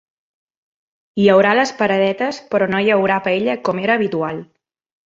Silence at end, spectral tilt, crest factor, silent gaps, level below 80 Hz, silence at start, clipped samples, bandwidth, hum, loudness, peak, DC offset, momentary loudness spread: 0.6 s; -5.5 dB/octave; 16 dB; none; -60 dBFS; 1.15 s; under 0.1%; 7.8 kHz; none; -16 LUFS; -2 dBFS; under 0.1%; 10 LU